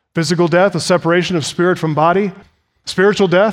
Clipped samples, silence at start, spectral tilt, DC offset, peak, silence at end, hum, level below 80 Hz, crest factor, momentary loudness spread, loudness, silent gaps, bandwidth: under 0.1%; 0.15 s; -5.5 dB/octave; under 0.1%; 0 dBFS; 0 s; none; -56 dBFS; 14 dB; 6 LU; -14 LUFS; none; 14.5 kHz